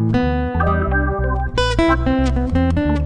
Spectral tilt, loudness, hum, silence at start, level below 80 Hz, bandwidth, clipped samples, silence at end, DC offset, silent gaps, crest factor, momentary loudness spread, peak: -7 dB/octave; -18 LUFS; none; 0 s; -22 dBFS; 10 kHz; under 0.1%; 0 s; under 0.1%; none; 14 dB; 4 LU; -2 dBFS